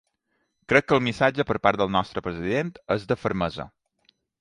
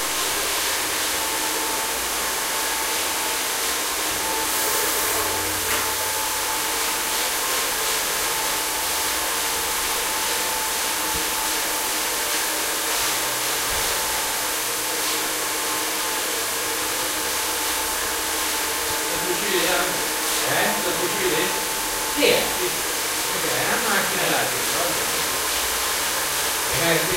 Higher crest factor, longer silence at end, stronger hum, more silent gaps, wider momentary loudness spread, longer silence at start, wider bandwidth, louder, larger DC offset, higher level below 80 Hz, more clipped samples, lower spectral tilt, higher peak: about the same, 22 dB vs 18 dB; first, 0.75 s vs 0 s; neither; neither; first, 10 LU vs 3 LU; first, 0.7 s vs 0 s; second, 11 kHz vs 16 kHz; second, -24 LUFS vs -21 LUFS; neither; about the same, -52 dBFS vs -48 dBFS; neither; first, -6 dB/octave vs -0.5 dB/octave; first, -2 dBFS vs -6 dBFS